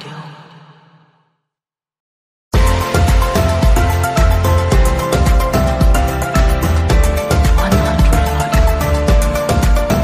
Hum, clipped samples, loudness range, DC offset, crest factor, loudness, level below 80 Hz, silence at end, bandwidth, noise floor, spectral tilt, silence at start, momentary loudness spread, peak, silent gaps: none; under 0.1%; 4 LU; under 0.1%; 12 dB; -14 LUFS; -16 dBFS; 0 s; 15.5 kHz; -88 dBFS; -6 dB/octave; 0 s; 2 LU; 0 dBFS; 2.00-2.51 s